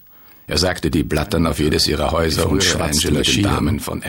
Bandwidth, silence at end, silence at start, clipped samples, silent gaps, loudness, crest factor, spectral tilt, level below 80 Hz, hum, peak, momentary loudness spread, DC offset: 17.5 kHz; 0 s; 0.5 s; under 0.1%; none; -17 LUFS; 14 dB; -4 dB/octave; -30 dBFS; none; -4 dBFS; 4 LU; 0.2%